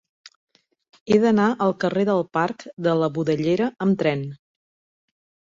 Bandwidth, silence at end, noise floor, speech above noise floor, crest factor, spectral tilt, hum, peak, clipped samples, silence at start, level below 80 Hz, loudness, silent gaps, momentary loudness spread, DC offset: 7.6 kHz; 1.25 s; under -90 dBFS; over 69 dB; 18 dB; -7.5 dB/octave; none; -6 dBFS; under 0.1%; 1.05 s; -62 dBFS; -22 LUFS; 2.73-2.77 s; 7 LU; under 0.1%